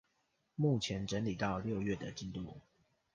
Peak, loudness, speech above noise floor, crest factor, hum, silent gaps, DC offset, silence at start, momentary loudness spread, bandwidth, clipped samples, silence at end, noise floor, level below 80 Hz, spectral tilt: -22 dBFS; -38 LUFS; 43 dB; 18 dB; none; none; under 0.1%; 0.6 s; 15 LU; 9.8 kHz; under 0.1%; 0.55 s; -80 dBFS; -60 dBFS; -6 dB/octave